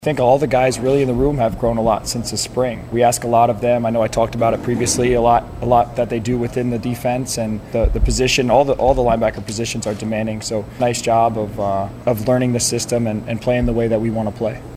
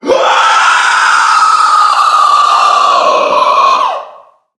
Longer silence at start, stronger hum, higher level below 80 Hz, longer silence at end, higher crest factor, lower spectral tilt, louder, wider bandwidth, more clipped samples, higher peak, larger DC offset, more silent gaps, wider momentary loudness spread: about the same, 0 s vs 0.05 s; neither; first, -30 dBFS vs -60 dBFS; second, 0 s vs 0.5 s; first, 16 dB vs 8 dB; first, -5 dB/octave vs 0 dB/octave; second, -18 LUFS vs -7 LUFS; first, 16 kHz vs 12 kHz; second, under 0.1% vs 0.2%; about the same, -2 dBFS vs 0 dBFS; neither; neither; first, 7 LU vs 2 LU